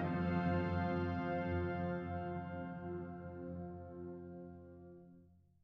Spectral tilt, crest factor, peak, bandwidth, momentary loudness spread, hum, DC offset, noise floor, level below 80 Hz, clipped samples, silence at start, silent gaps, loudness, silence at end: -10 dB/octave; 16 dB; -26 dBFS; 5.6 kHz; 18 LU; none; under 0.1%; -65 dBFS; -62 dBFS; under 0.1%; 0 s; none; -41 LUFS; 0.35 s